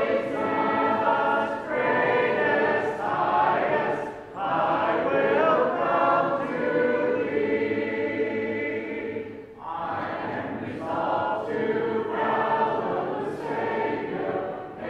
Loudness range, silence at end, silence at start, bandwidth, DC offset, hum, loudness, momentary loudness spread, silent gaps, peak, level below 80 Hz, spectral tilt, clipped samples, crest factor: 6 LU; 0 s; 0 s; 9 kHz; under 0.1%; none; -25 LUFS; 9 LU; none; -8 dBFS; -62 dBFS; -7 dB/octave; under 0.1%; 16 dB